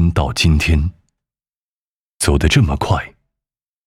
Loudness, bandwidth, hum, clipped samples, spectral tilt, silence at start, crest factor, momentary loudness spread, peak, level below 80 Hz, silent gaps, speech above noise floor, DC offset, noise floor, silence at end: -16 LUFS; 14.5 kHz; none; under 0.1%; -5 dB/octave; 0 s; 16 dB; 8 LU; -2 dBFS; -24 dBFS; 1.56-2.20 s; over 76 dB; under 0.1%; under -90 dBFS; 0.8 s